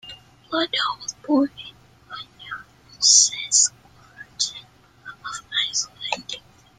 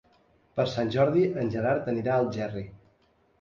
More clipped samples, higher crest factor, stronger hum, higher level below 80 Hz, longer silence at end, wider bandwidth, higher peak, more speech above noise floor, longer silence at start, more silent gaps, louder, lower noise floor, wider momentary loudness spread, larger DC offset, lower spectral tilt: neither; first, 24 dB vs 16 dB; neither; about the same, -62 dBFS vs -58 dBFS; second, 0.4 s vs 0.65 s; first, 13.5 kHz vs 7.4 kHz; first, -2 dBFS vs -12 dBFS; second, 27 dB vs 40 dB; second, 0.05 s vs 0.55 s; neither; first, -20 LUFS vs -27 LUFS; second, -48 dBFS vs -66 dBFS; first, 25 LU vs 12 LU; neither; second, 0.5 dB/octave vs -7.5 dB/octave